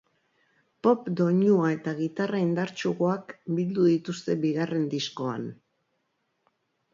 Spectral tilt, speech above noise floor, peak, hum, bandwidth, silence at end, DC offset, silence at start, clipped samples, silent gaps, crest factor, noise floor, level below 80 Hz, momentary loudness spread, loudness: -7 dB/octave; 50 dB; -8 dBFS; none; 7.6 kHz; 1.4 s; under 0.1%; 0.85 s; under 0.1%; none; 18 dB; -76 dBFS; -74 dBFS; 9 LU; -27 LUFS